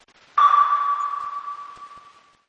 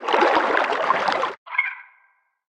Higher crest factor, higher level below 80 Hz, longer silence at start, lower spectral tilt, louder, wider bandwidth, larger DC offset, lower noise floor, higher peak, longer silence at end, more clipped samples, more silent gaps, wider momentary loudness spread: about the same, 16 dB vs 18 dB; about the same, -70 dBFS vs -66 dBFS; first, 0.35 s vs 0 s; second, -0.5 dB/octave vs -3 dB/octave; about the same, -20 LUFS vs -21 LUFS; second, 7.4 kHz vs 10.5 kHz; neither; second, -51 dBFS vs -63 dBFS; about the same, -6 dBFS vs -4 dBFS; second, 0.5 s vs 0.65 s; neither; second, none vs 1.38-1.46 s; first, 20 LU vs 8 LU